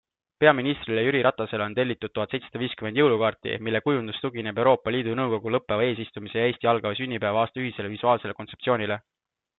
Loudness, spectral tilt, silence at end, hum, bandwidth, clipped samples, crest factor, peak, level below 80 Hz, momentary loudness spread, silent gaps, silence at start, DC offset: -25 LUFS; -9.5 dB/octave; 0.6 s; none; 4.2 kHz; under 0.1%; 22 dB; -2 dBFS; -64 dBFS; 9 LU; none; 0.4 s; under 0.1%